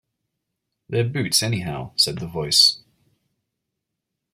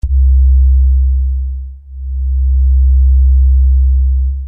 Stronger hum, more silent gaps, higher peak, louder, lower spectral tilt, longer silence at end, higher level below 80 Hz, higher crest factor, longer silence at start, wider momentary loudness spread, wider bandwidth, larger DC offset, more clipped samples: neither; neither; about the same, -2 dBFS vs -4 dBFS; second, -19 LUFS vs -12 LUFS; second, -3 dB/octave vs -12.5 dB/octave; first, 1.55 s vs 0 s; second, -56 dBFS vs -10 dBFS; first, 22 dB vs 6 dB; first, 0.9 s vs 0.05 s; about the same, 13 LU vs 13 LU; first, 16.5 kHz vs 0.2 kHz; neither; neither